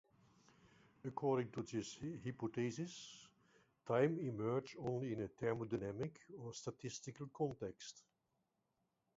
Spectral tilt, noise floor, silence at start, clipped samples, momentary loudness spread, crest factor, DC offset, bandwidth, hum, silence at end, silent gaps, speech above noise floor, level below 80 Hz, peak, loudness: -6.5 dB/octave; -86 dBFS; 1.05 s; under 0.1%; 15 LU; 22 dB; under 0.1%; 7.6 kHz; none; 1.2 s; none; 43 dB; -76 dBFS; -24 dBFS; -44 LUFS